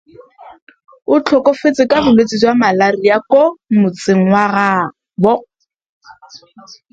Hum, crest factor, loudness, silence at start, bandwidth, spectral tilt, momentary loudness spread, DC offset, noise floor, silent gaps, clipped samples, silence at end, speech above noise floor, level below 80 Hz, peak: none; 14 dB; -13 LUFS; 0.4 s; 8 kHz; -6 dB/octave; 5 LU; under 0.1%; -39 dBFS; 0.62-0.67 s, 5.86-6.01 s; under 0.1%; 0.55 s; 27 dB; -50 dBFS; 0 dBFS